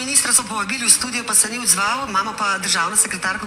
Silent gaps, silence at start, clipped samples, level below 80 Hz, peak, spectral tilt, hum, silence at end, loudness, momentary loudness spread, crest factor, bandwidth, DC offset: none; 0 s; under 0.1%; -54 dBFS; 0 dBFS; 0 dB/octave; none; 0 s; -16 LUFS; 6 LU; 18 dB; 16.5 kHz; under 0.1%